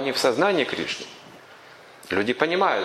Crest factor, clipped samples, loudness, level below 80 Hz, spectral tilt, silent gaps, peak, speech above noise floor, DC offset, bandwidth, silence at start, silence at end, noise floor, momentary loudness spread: 22 dB; under 0.1%; -23 LUFS; -66 dBFS; -3.5 dB/octave; none; -2 dBFS; 24 dB; under 0.1%; 15 kHz; 0 s; 0 s; -47 dBFS; 19 LU